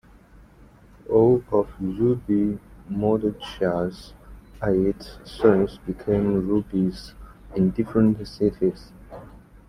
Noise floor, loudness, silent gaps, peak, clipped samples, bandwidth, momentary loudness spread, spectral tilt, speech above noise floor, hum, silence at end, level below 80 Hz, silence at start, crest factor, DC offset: -50 dBFS; -23 LUFS; none; -4 dBFS; under 0.1%; 12.5 kHz; 21 LU; -8.5 dB/octave; 28 dB; none; 0.3 s; -46 dBFS; 1.1 s; 20 dB; under 0.1%